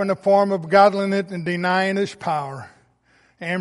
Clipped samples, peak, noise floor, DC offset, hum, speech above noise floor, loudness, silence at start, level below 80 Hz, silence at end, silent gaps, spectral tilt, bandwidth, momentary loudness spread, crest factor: under 0.1%; -2 dBFS; -59 dBFS; under 0.1%; none; 40 dB; -19 LUFS; 0 s; -66 dBFS; 0 s; none; -6 dB/octave; 11.5 kHz; 14 LU; 18 dB